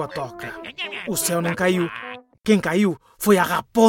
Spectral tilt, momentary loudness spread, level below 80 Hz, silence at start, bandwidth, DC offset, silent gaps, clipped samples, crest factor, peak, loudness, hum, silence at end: -4.5 dB/octave; 14 LU; -56 dBFS; 0 s; 17 kHz; under 0.1%; none; under 0.1%; 18 dB; -2 dBFS; -22 LUFS; none; 0 s